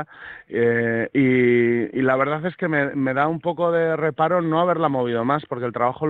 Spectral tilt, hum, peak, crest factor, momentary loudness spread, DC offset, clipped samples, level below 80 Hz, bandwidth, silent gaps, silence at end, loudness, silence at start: -9.5 dB/octave; none; -4 dBFS; 16 dB; 6 LU; under 0.1%; under 0.1%; -60 dBFS; 4.3 kHz; none; 0 s; -21 LUFS; 0 s